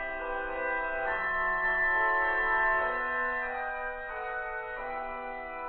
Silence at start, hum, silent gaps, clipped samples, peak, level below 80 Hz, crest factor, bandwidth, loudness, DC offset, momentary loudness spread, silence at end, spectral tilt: 0 s; none; none; under 0.1%; -16 dBFS; -50 dBFS; 14 dB; 4.5 kHz; -30 LUFS; under 0.1%; 11 LU; 0 s; -7 dB/octave